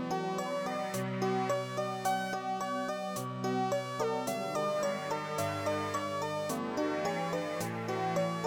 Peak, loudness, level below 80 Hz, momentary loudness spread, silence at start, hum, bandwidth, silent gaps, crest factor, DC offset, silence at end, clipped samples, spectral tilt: -20 dBFS; -34 LUFS; -72 dBFS; 3 LU; 0 s; none; over 20 kHz; none; 14 dB; under 0.1%; 0 s; under 0.1%; -5 dB/octave